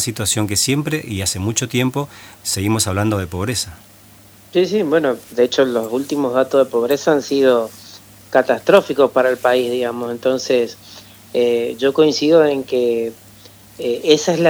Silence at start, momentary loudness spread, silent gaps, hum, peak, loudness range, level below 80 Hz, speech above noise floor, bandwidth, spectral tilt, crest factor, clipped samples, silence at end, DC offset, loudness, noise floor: 0 s; 9 LU; none; none; 0 dBFS; 4 LU; -52 dBFS; 28 dB; over 20 kHz; -4.5 dB/octave; 18 dB; under 0.1%; 0 s; under 0.1%; -17 LUFS; -45 dBFS